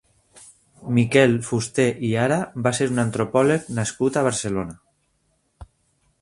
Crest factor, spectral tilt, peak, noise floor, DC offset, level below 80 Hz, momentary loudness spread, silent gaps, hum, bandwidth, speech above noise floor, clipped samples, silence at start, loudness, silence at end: 20 dB; -5.5 dB/octave; -2 dBFS; -68 dBFS; under 0.1%; -54 dBFS; 9 LU; none; none; 11.5 kHz; 47 dB; under 0.1%; 0.4 s; -21 LUFS; 0.55 s